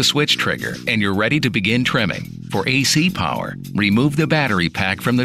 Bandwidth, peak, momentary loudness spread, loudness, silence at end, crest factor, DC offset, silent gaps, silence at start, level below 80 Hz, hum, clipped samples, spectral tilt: 15.5 kHz; -4 dBFS; 7 LU; -18 LUFS; 0 s; 14 dB; 0.1%; none; 0 s; -48 dBFS; none; under 0.1%; -4.5 dB/octave